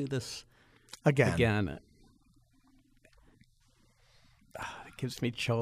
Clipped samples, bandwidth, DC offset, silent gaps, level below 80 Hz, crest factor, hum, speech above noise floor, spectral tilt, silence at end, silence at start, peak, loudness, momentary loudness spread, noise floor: under 0.1%; 15 kHz; under 0.1%; none; -58 dBFS; 22 dB; none; 36 dB; -6 dB/octave; 0 s; 0 s; -12 dBFS; -32 LUFS; 19 LU; -67 dBFS